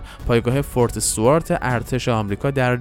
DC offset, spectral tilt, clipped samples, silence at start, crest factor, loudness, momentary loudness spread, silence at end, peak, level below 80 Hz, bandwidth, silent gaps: under 0.1%; -5 dB/octave; under 0.1%; 0 s; 16 dB; -20 LUFS; 5 LU; 0 s; -4 dBFS; -36 dBFS; 17 kHz; none